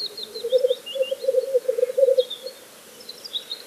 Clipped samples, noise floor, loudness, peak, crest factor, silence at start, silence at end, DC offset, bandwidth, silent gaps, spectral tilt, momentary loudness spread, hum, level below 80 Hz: under 0.1%; -45 dBFS; -23 LUFS; -6 dBFS; 18 dB; 0 s; 0 s; under 0.1%; 15.5 kHz; none; -1 dB/octave; 19 LU; none; -80 dBFS